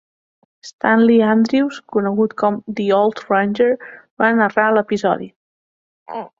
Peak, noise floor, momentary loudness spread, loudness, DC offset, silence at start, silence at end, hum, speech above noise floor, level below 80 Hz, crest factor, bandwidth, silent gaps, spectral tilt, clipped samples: -2 dBFS; under -90 dBFS; 10 LU; -17 LUFS; under 0.1%; 0.65 s; 0.15 s; none; over 74 dB; -62 dBFS; 16 dB; 7.6 kHz; 0.73-0.79 s, 4.11-4.17 s, 5.36-6.06 s; -6.5 dB/octave; under 0.1%